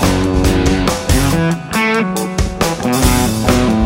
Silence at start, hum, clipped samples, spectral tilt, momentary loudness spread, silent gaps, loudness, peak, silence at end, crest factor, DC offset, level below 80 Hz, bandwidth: 0 s; none; under 0.1%; -5 dB/octave; 4 LU; none; -14 LUFS; 0 dBFS; 0 s; 12 dB; under 0.1%; -22 dBFS; 16.5 kHz